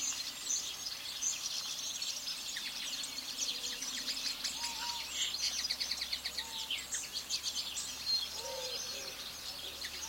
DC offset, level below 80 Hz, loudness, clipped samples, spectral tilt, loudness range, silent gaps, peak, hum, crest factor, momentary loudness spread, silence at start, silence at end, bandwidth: under 0.1%; -66 dBFS; -36 LUFS; under 0.1%; 1.5 dB/octave; 1 LU; none; -20 dBFS; none; 18 dB; 6 LU; 0 s; 0 s; 16.5 kHz